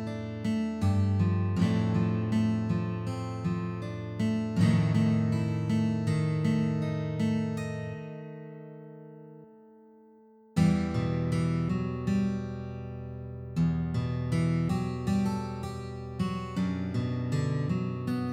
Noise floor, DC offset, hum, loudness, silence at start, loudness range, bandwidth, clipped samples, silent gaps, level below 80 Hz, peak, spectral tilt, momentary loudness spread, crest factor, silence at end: -57 dBFS; under 0.1%; none; -30 LUFS; 0 s; 6 LU; 11.5 kHz; under 0.1%; none; -50 dBFS; -12 dBFS; -8 dB/octave; 13 LU; 18 dB; 0 s